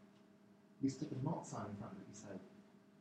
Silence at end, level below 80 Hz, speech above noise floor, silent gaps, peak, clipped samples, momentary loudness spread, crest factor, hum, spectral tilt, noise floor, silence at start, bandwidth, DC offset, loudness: 0 s; -80 dBFS; 22 dB; none; -28 dBFS; under 0.1%; 24 LU; 20 dB; none; -6.5 dB/octave; -66 dBFS; 0 s; 10 kHz; under 0.1%; -46 LUFS